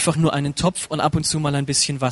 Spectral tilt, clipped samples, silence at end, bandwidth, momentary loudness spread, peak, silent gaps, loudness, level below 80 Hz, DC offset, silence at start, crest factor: -4 dB/octave; under 0.1%; 0 s; 11.5 kHz; 3 LU; -4 dBFS; none; -20 LUFS; -44 dBFS; under 0.1%; 0 s; 16 dB